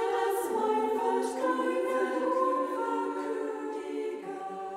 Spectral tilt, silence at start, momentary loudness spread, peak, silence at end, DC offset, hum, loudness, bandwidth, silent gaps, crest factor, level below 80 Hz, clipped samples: -3.5 dB/octave; 0 s; 8 LU; -16 dBFS; 0 s; under 0.1%; none; -31 LUFS; 16 kHz; none; 14 dB; -76 dBFS; under 0.1%